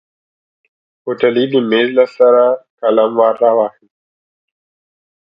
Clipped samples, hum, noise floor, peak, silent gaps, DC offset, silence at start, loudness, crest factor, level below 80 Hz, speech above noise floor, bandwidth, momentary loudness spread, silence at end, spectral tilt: under 0.1%; none; under -90 dBFS; 0 dBFS; 2.70-2.78 s; under 0.1%; 1.05 s; -13 LUFS; 14 dB; -66 dBFS; over 78 dB; 5.4 kHz; 8 LU; 1.5 s; -7.5 dB/octave